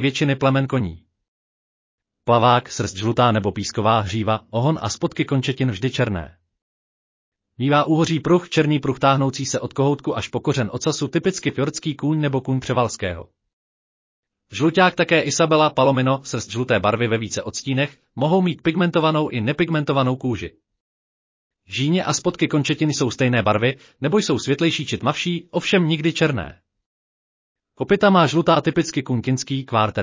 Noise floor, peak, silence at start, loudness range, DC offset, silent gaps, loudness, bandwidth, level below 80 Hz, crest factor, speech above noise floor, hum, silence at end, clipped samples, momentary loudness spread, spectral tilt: under -90 dBFS; -2 dBFS; 0 s; 4 LU; under 0.1%; 1.28-1.98 s, 6.62-7.32 s, 13.53-14.23 s, 20.80-21.50 s, 26.86-27.55 s; -20 LUFS; 7.8 kHz; -48 dBFS; 18 dB; over 70 dB; none; 0 s; under 0.1%; 8 LU; -5.5 dB/octave